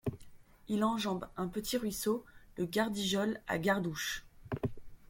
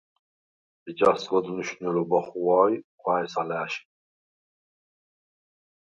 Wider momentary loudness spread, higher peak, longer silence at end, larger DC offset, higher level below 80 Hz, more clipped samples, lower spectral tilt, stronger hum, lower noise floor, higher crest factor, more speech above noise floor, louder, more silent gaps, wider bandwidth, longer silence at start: about the same, 9 LU vs 11 LU; second, -16 dBFS vs -6 dBFS; second, 0.05 s vs 2.05 s; neither; first, -58 dBFS vs -70 dBFS; neither; about the same, -4.5 dB/octave vs -5.5 dB/octave; neither; second, -54 dBFS vs under -90 dBFS; about the same, 20 dB vs 22 dB; second, 20 dB vs over 65 dB; second, -35 LUFS vs -26 LUFS; second, none vs 2.84-2.98 s; first, 16.5 kHz vs 9.6 kHz; second, 0.05 s vs 0.85 s